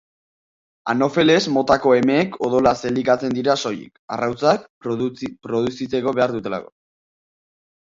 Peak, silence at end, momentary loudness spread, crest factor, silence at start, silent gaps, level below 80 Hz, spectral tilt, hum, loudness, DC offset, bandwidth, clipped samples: -2 dBFS; 1.25 s; 12 LU; 18 dB; 0.85 s; 3.99-4.08 s, 4.70-4.81 s; -54 dBFS; -5.5 dB/octave; none; -19 LUFS; under 0.1%; 7.8 kHz; under 0.1%